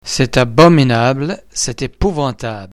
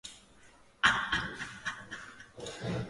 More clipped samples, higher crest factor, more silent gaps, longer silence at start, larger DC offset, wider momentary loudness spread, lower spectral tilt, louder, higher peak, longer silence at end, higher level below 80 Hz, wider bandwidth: first, 0.3% vs under 0.1%; second, 14 dB vs 26 dB; neither; about the same, 0.05 s vs 0.05 s; neither; second, 12 LU vs 18 LU; first, -5 dB/octave vs -3 dB/octave; first, -14 LUFS vs -32 LUFS; first, 0 dBFS vs -10 dBFS; about the same, 0.05 s vs 0 s; first, -32 dBFS vs -58 dBFS; first, 14 kHz vs 11.5 kHz